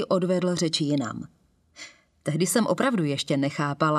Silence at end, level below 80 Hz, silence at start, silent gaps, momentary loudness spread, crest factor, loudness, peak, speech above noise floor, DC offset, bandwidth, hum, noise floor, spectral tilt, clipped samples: 0 s; -66 dBFS; 0 s; none; 21 LU; 18 dB; -25 LUFS; -8 dBFS; 23 dB; under 0.1%; 14.5 kHz; none; -48 dBFS; -5 dB/octave; under 0.1%